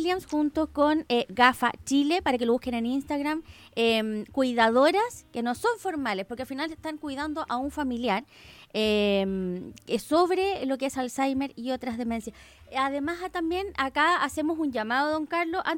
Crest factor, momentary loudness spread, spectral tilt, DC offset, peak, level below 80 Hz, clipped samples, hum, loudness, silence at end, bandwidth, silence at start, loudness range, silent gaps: 22 dB; 10 LU; -4.5 dB/octave; under 0.1%; -6 dBFS; -56 dBFS; under 0.1%; none; -27 LUFS; 0 s; 17.5 kHz; 0 s; 5 LU; none